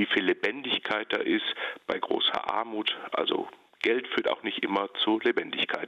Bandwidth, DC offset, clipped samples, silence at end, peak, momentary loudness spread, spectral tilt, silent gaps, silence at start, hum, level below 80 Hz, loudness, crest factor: 8.4 kHz; under 0.1%; under 0.1%; 0 s; -10 dBFS; 6 LU; -4.5 dB/octave; none; 0 s; none; -74 dBFS; -28 LUFS; 18 dB